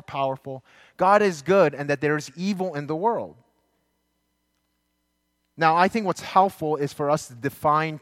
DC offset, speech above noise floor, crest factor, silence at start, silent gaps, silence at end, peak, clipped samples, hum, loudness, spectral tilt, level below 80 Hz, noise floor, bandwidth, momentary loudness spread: under 0.1%; 51 dB; 20 dB; 0.1 s; none; 0.05 s; -4 dBFS; under 0.1%; none; -23 LUFS; -5.5 dB/octave; -66 dBFS; -74 dBFS; 16.5 kHz; 10 LU